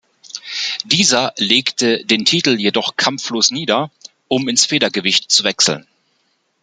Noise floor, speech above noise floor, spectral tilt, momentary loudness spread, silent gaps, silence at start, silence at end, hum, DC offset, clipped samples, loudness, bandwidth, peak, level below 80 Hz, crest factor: -64 dBFS; 48 dB; -2 dB/octave; 9 LU; none; 0.25 s; 0.8 s; none; under 0.1%; under 0.1%; -15 LUFS; 12 kHz; 0 dBFS; -60 dBFS; 18 dB